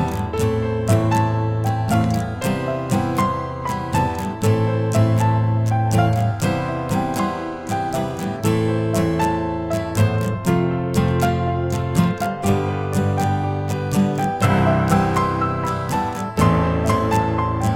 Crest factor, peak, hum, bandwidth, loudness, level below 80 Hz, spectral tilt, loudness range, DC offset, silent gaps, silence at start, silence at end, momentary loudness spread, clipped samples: 16 dB; -2 dBFS; none; 17 kHz; -20 LUFS; -42 dBFS; -7 dB/octave; 2 LU; under 0.1%; none; 0 s; 0 s; 6 LU; under 0.1%